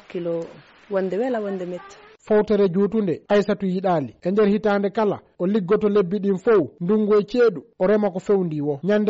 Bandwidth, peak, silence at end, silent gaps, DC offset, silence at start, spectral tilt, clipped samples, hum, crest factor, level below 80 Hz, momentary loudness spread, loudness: 7.8 kHz; -10 dBFS; 0 s; none; under 0.1%; 0.1 s; -6.5 dB/octave; under 0.1%; none; 10 dB; -56 dBFS; 9 LU; -21 LUFS